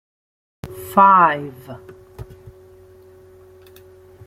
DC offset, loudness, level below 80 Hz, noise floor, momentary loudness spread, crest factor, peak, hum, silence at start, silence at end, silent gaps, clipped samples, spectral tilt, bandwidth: under 0.1%; -14 LUFS; -52 dBFS; -46 dBFS; 28 LU; 20 dB; -2 dBFS; none; 0.65 s; 2.05 s; none; under 0.1%; -6 dB/octave; 16 kHz